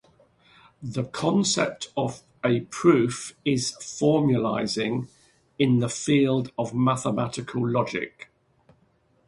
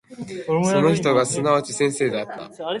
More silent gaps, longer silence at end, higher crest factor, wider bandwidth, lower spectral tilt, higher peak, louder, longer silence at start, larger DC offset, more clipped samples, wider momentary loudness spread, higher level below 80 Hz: neither; first, 1.05 s vs 0 s; about the same, 18 dB vs 16 dB; about the same, 11.5 kHz vs 11.5 kHz; about the same, -5.5 dB/octave vs -5 dB/octave; about the same, -6 dBFS vs -4 dBFS; second, -25 LUFS vs -20 LUFS; first, 0.8 s vs 0.1 s; neither; neither; second, 10 LU vs 14 LU; about the same, -60 dBFS vs -60 dBFS